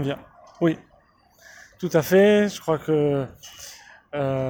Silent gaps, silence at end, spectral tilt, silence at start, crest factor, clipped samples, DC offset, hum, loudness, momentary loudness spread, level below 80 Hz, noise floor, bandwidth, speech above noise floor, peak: none; 0 s; -6 dB/octave; 0 s; 16 dB; under 0.1%; under 0.1%; none; -22 LUFS; 22 LU; -60 dBFS; -58 dBFS; over 20 kHz; 36 dB; -6 dBFS